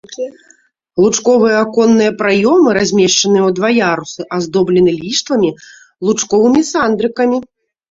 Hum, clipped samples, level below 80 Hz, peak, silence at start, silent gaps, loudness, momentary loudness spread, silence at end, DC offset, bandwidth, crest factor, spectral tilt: none; under 0.1%; -52 dBFS; 0 dBFS; 0.1 s; none; -12 LUFS; 10 LU; 0.5 s; under 0.1%; 7.8 kHz; 12 dB; -4 dB/octave